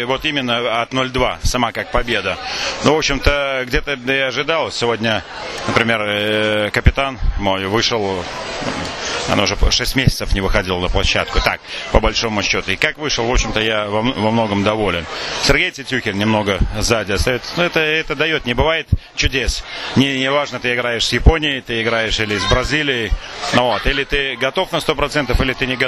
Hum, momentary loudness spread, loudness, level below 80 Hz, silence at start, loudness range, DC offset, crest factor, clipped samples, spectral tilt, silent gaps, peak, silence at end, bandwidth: none; 6 LU; -17 LUFS; -26 dBFS; 0 s; 1 LU; under 0.1%; 18 dB; under 0.1%; -4 dB/octave; none; 0 dBFS; 0 s; 14 kHz